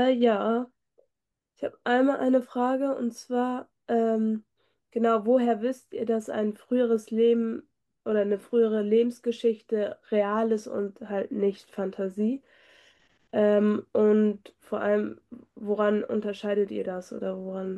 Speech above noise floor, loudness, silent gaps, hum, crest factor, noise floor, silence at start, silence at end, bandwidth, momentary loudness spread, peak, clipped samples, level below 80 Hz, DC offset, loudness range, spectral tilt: 58 dB; -27 LUFS; none; none; 16 dB; -84 dBFS; 0 s; 0 s; 12 kHz; 11 LU; -12 dBFS; under 0.1%; -74 dBFS; under 0.1%; 3 LU; -7 dB/octave